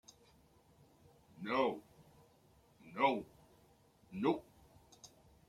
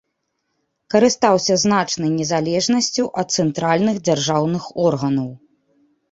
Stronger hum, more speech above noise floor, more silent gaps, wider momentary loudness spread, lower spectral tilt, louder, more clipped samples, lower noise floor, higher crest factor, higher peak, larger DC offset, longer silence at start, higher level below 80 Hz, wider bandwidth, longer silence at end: neither; second, 33 dB vs 55 dB; neither; first, 24 LU vs 6 LU; about the same, -5.5 dB/octave vs -4.5 dB/octave; second, -38 LUFS vs -18 LUFS; neither; second, -68 dBFS vs -73 dBFS; first, 24 dB vs 18 dB; second, -18 dBFS vs -2 dBFS; neither; first, 1.4 s vs 0.9 s; second, -74 dBFS vs -58 dBFS; first, 16 kHz vs 8 kHz; second, 0.4 s vs 0.75 s